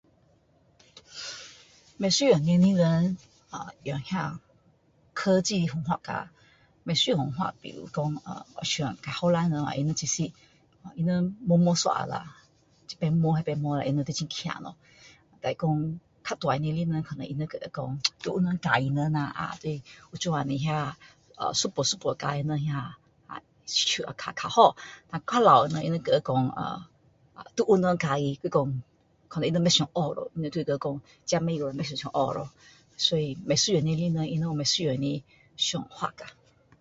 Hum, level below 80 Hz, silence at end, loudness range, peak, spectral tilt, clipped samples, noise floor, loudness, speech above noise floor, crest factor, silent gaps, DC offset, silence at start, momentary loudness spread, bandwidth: none; -60 dBFS; 0.5 s; 6 LU; -4 dBFS; -5 dB/octave; under 0.1%; -64 dBFS; -27 LUFS; 37 dB; 24 dB; none; under 0.1%; 0.95 s; 16 LU; 8 kHz